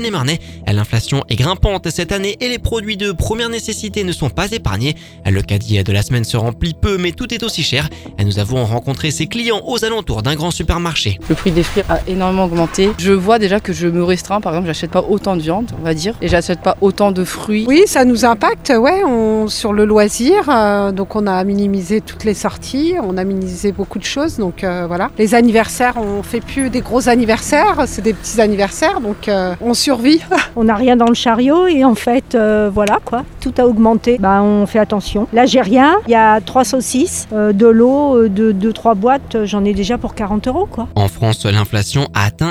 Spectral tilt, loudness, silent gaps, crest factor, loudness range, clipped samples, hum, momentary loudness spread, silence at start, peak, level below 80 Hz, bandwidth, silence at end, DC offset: -5.5 dB/octave; -14 LUFS; none; 14 dB; 6 LU; under 0.1%; none; 8 LU; 0 s; 0 dBFS; -32 dBFS; over 20 kHz; 0 s; under 0.1%